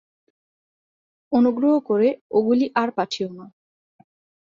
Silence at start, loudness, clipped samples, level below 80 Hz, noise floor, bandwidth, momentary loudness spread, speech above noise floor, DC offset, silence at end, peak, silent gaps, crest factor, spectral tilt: 1.3 s; -21 LUFS; under 0.1%; -68 dBFS; under -90 dBFS; 7.4 kHz; 8 LU; over 70 dB; under 0.1%; 1 s; -6 dBFS; 2.21-2.30 s; 18 dB; -6 dB/octave